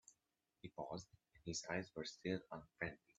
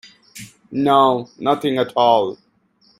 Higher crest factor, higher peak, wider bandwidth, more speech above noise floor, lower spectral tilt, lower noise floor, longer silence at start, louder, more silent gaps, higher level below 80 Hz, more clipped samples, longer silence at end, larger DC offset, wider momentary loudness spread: first, 24 dB vs 18 dB; second, -26 dBFS vs -2 dBFS; second, 8.4 kHz vs 15.5 kHz; about the same, 40 dB vs 42 dB; second, -4 dB/octave vs -6 dB/octave; first, -89 dBFS vs -58 dBFS; second, 0.1 s vs 0.35 s; second, -48 LUFS vs -17 LUFS; neither; second, -74 dBFS vs -64 dBFS; neither; second, 0.25 s vs 0.65 s; neither; second, 14 LU vs 23 LU